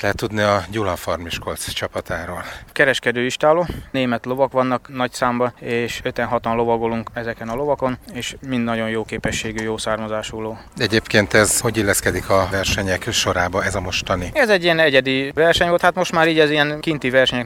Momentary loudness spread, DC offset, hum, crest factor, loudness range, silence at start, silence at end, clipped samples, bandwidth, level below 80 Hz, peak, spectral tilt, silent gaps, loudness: 11 LU; under 0.1%; none; 18 dB; 6 LU; 0 s; 0 s; under 0.1%; 17.5 kHz; -42 dBFS; 0 dBFS; -4 dB/octave; none; -19 LUFS